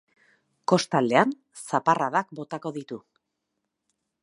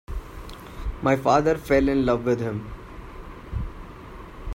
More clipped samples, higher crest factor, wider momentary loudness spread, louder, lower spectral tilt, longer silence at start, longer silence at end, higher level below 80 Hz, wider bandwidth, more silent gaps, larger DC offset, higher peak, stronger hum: neither; first, 24 dB vs 18 dB; second, 16 LU vs 22 LU; about the same, -25 LUFS vs -23 LUFS; second, -5 dB/octave vs -7 dB/octave; first, 0.7 s vs 0.1 s; first, 1.25 s vs 0 s; second, -78 dBFS vs -36 dBFS; second, 11.5 kHz vs 16 kHz; neither; neither; first, -2 dBFS vs -6 dBFS; neither